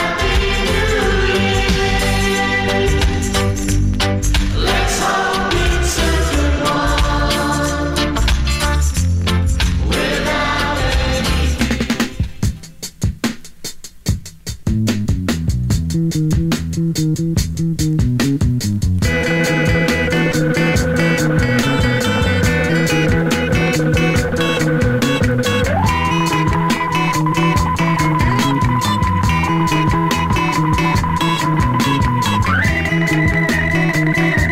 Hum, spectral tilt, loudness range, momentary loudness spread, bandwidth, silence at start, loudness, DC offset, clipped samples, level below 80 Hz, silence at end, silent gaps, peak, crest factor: none; -5 dB/octave; 4 LU; 4 LU; 16 kHz; 0 s; -16 LUFS; 0.7%; under 0.1%; -24 dBFS; 0 s; none; -2 dBFS; 14 dB